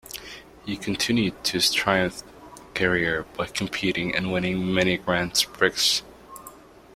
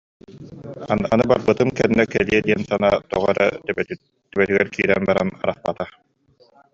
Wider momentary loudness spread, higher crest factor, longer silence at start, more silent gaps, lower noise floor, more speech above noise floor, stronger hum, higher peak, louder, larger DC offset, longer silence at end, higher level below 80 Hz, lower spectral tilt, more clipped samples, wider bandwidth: first, 18 LU vs 14 LU; about the same, 22 dB vs 18 dB; second, 0.05 s vs 0.3 s; neither; second, -47 dBFS vs -57 dBFS; second, 23 dB vs 38 dB; neither; about the same, -2 dBFS vs -2 dBFS; second, -23 LUFS vs -20 LUFS; neither; second, 0.35 s vs 0.85 s; about the same, -52 dBFS vs -50 dBFS; second, -3.5 dB/octave vs -6.5 dB/octave; neither; first, 16.5 kHz vs 7.6 kHz